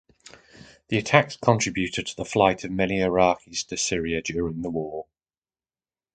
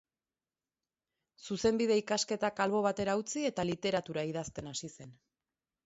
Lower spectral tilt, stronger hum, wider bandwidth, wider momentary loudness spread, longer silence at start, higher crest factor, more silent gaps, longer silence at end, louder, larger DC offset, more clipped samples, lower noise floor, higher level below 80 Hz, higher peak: about the same, -4.5 dB/octave vs -4 dB/octave; neither; first, 9.6 kHz vs 8 kHz; about the same, 10 LU vs 11 LU; second, 0.55 s vs 1.4 s; first, 26 dB vs 18 dB; neither; first, 1.15 s vs 0.75 s; first, -24 LUFS vs -33 LUFS; neither; neither; about the same, under -90 dBFS vs under -90 dBFS; first, -50 dBFS vs -66 dBFS; first, 0 dBFS vs -16 dBFS